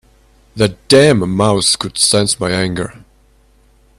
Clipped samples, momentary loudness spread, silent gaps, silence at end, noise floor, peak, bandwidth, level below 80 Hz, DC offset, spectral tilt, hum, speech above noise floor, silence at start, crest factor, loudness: under 0.1%; 9 LU; none; 1 s; -50 dBFS; 0 dBFS; 14 kHz; -44 dBFS; under 0.1%; -4 dB/octave; none; 37 dB; 0.55 s; 16 dB; -13 LUFS